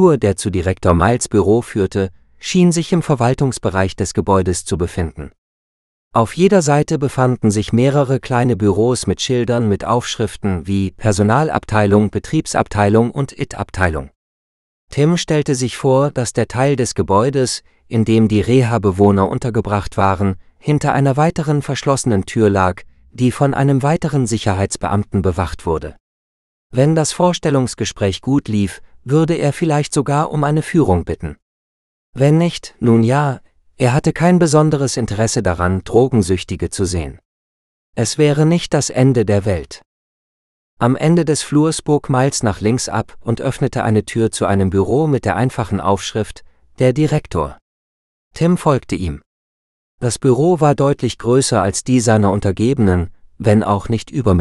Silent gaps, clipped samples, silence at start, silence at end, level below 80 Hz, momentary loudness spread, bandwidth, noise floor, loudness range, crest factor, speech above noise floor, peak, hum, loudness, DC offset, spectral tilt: 5.38-6.11 s, 14.16-14.88 s, 26.00-26.70 s, 31.42-32.13 s, 37.25-37.93 s, 39.86-40.77 s, 47.62-48.31 s, 49.26-49.98 s; under 0.1%; 0 s; 0 s; -38 dBFS; 8 LU; 12.5 kHz; under -90 dBFS; 3 LU; 16 dB; over 75 dB; 0 dBFS; none; -16 LUFS; under 0.1%; -6 dB/octave